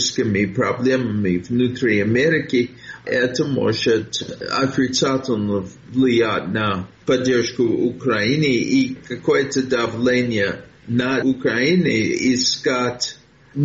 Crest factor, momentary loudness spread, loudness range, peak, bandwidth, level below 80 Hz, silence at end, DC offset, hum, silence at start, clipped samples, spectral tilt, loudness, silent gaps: 12 dB; 7 LU; 1 LU; -6 dBFS; 8 kHz; -54 dBFS; 0 s; under 0.1%; none; 0 s; under 0.1%; -4.5 dB/octave; -19 LUFS; none